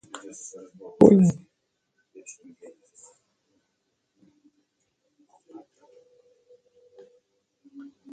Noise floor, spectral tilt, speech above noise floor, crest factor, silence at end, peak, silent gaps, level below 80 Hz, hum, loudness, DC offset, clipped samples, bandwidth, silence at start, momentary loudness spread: -77 dBFS; -8.5 dB/octave; 55 dB; 28 dB; 6.8 s; 0 dBFS; none; -64 dBFS; none; -18 LUFS; under 0.1%; under 0.1%; 9.2 kHz; 1 s; 32 LU